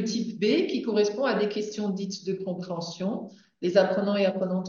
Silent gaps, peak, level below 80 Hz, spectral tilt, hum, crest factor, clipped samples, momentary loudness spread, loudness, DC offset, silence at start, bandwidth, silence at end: none; -8 dBFS; -78 dBFS; -5.5 dB/octave; none; 18 dB; under 0.1%; 9 LU; -27 LUFS; under 0.1%; 0 s; 7.4 kHz; 0 s